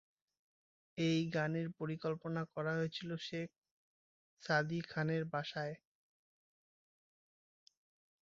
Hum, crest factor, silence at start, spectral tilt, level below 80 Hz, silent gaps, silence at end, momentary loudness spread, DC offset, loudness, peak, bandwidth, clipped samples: none; 22 dB; 0.95 s; -5 dB/octave; -78 dBFS; 3.58-3.62 s, 3.71-4.37 s; 2.5 s; 10 LU; under 0.1%; -39 LUFS; -18 dBFS; 7.6 kHz; under 0.1%